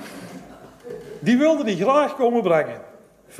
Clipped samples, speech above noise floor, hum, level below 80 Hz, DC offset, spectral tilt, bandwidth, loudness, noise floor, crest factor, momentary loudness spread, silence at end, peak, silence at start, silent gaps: under 0.1%; 29 dB; none; -62 dBFS; under 0.1%; -6 dB/octave; 14.5 kHz; -20 LUFS; -48 dBFS; 16 dB; 21 LU; 0 s; -6 dBFS; 0 s; none